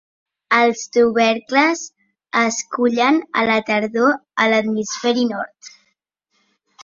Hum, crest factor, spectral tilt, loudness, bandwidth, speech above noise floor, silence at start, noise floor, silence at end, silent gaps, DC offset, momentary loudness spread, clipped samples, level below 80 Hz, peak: none; 18 dB; -3 dB/octave; -18 LUFS; 7.6 kHz; 52 dB; 0.5 s; -69 dBFS; 0 s; none; under 0.1%; 7 LU; under 0.1%; -64 dBFS; -2 dBFS